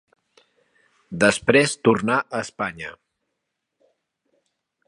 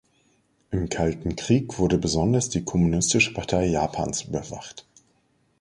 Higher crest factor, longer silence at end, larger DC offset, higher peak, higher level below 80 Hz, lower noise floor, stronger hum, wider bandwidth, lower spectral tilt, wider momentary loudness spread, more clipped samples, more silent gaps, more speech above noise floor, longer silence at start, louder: first, 24 dB vs 18 dB; first, 1.95 s vs 0.8 s; neither; first, 0 dBFS vs -6 dBFS; second, -58 dBFS vs -42 dBFS; first, -79 dBFS vs -66 dBFS; neither; about the same, 11.5 kHz vs 11.5 kHz; about the same, -4.5 dB/octave vs -4.5 dB/octave; first, 19 LU vs 11 LU; neither; neither; first, 59 dB vs 43 dB; first, 1.1 s vs 0.7 s; first, -20 LUFS vs -24 LUFS